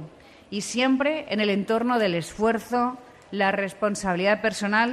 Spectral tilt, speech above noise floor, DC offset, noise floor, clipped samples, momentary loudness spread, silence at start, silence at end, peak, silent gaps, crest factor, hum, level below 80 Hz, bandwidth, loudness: -4.5 dB/octave; 21 dB; under 0.1%; -45 dBFS; under 0.1%; 9 LU; 0 s; 0 s; -8 dBFS; none; 16 dB; none; -58 dBFS; 14 kHz; -24 LUFS